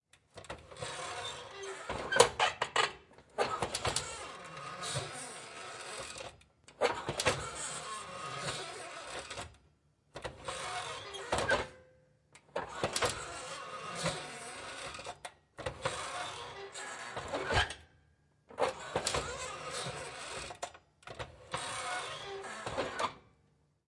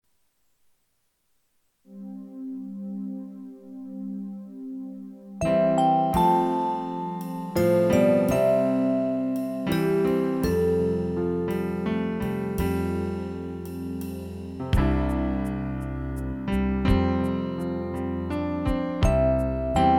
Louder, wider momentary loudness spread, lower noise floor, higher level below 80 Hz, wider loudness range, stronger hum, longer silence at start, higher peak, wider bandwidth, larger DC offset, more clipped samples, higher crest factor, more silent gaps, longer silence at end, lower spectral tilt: second, -37 LUFS vs -25 LUFS; about the same, 14 LU vs 16 LU; about the same, -71 dBFS vs -71 dBFS; second, -58 dBFS vs -36 dBFS; second, 8 LU vs 14 LU; neither; second, 0.35 s vs 1.9 s; about the same, -6 dBFS vs -8 dBFS; second, 11.5 kHz vs 18 kHz; neither; neither; first, 34 dB vs 16 dB; neither; first, 0.65 s vs 0 s; second, -2.5 dB/octave vs -7.5 dB/octave